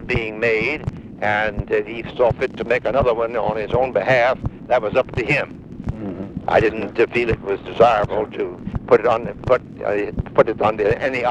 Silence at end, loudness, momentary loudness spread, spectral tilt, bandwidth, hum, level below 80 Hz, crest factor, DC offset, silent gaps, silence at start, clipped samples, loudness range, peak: 0 s; -20 LUFS; 11 LU; -7 dB/octave; 9.4 kHz; none; -38 dBFS; 18 dB; under 0.1%; none; 0 s; under 0.1%; 2 LU; 0 dBFS